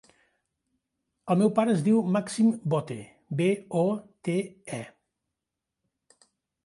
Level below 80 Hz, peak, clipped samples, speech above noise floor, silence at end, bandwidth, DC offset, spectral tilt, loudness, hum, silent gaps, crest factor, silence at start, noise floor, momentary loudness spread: -72 dBFS; -10 dBFS; under 0.1%; 61 dB; 1.75 s; 11.5 kHz; under 0.1%; -7 dB/octave; -26 LUFS; none; none; 20 dB; 1.25 s; -86 dBFS; 16 LU